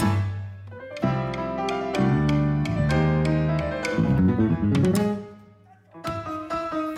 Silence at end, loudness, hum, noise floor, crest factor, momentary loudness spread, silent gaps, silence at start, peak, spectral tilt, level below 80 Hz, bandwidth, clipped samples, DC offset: 0 s; -24 LUFS; none; -52 dBFS; 12 dB; 12 LU; none; 0 s; -12 dBFS; -7.5 dB/octave; -40 dBFS; 14.5 kHz; under 0.1%; under 0.1%